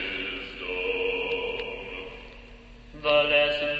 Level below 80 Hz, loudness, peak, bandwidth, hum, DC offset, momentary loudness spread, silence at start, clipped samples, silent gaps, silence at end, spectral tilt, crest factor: -50 dBFS; -26 LUFS; -10 dBFS; 7.6 kHz; none; under 0.1%; 18 LU; 0 s; under 0.1%; none; 0 s; -4.5 dB/octave; 18 dB